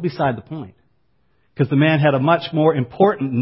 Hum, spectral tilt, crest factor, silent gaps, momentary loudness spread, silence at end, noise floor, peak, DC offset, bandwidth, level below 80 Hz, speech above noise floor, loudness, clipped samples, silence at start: none; -12 dB/octave; 16 dB; none; 16 LU; 0 s; -65 dBFS; -2 dBFS; under 0.1%; 5.8 kHz; -56 dBFS; 48 dB; -17 LUFS; under 0.1%; 0 s